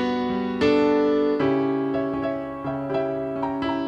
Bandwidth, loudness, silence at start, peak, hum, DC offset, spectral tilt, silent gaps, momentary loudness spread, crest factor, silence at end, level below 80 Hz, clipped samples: 7.8 kHz; -23 LUFS; 0 s; -8 dBFS; none; under 0.1%; -7.5 dB/octave; none; 8 LU; 16 dB; 0 s; -52 dBFS; under 0.1%